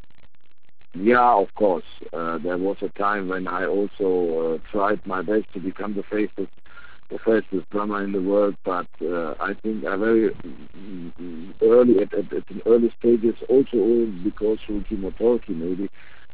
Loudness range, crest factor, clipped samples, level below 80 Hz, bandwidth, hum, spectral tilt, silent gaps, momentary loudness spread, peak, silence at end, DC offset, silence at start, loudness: 6 LU; 18 dB; under 0.1%; -50 dBFS; 4 kHz; none; -10.5 dB/octave; none; 15 LU; -6 dBFS; 0.45 s; 2%; 0.95 s; -22 LUFS